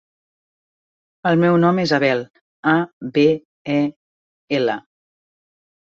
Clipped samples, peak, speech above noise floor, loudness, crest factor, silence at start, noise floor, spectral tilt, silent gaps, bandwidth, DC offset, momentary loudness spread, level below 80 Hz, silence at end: under 0.1%; -2 dBFS; over 73 dB; -19 LUFS; 18 dB; 1.25 s; under -90 dBFS; -7 dB/octave; 2.30-2.34 s, 2.41-2.63 s, 2.93-3.00 s, 3.45-3.65 s, 3.96-4.48 s; 7.6 kHz; under 0.1%; 10 LU; -62 dBFS; 1.15 s